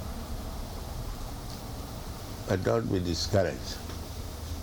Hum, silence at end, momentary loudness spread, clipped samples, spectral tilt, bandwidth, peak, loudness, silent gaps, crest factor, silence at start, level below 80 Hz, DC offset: none; 0 s; 12 LU; under 0.1%; -5.5 dB/octave; 19.5 kHz; -12 dBFS; -33 LUFS; none; 20 dB; 0 s; -40 dBFS; under 0.1%